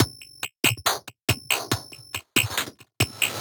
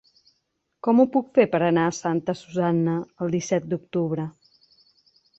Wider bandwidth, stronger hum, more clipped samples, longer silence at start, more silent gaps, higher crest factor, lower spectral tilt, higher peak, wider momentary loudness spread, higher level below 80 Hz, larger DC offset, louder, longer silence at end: first, over 20 kHz vs 8.2 kHz; neither; neither; second, 0 s vs 0.85 s; first, 1.24-1.28 s vs none; about the same, 24 dB vs 20 dB; second, -2.5 dB/octave vs -6.5 dB/octave; about the same, -2 dBFS vs -4 dBFS; first, 12 LU vs 9 LU; first, -54 dBFS vs -66 dBFS; neither; about the same, -25 LUFS vs -23 LUFS; second, 0 s vs 1.1 s